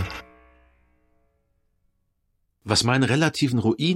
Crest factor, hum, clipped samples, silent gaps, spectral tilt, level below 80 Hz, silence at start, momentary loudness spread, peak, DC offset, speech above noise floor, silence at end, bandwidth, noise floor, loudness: 20 dB; none; under 0.1%; none; -5 dB/octave; -52 dBFS; 0 s; 17 LU; -6 dBFS; under 0.1%; 51 dB; 0 s; 16 kHz; -71 dBFS; -22 LUFS